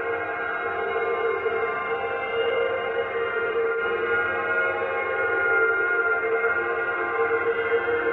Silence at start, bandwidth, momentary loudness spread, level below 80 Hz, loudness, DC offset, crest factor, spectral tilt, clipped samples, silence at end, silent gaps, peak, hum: 0 s; 4.3 kHz; 5 LU; -60 dBFS; -24 LUFS; under 0.1%; 14 dB; -6.5 dB/octave; under 0.1%; 0 s; none; -10 dBFS; none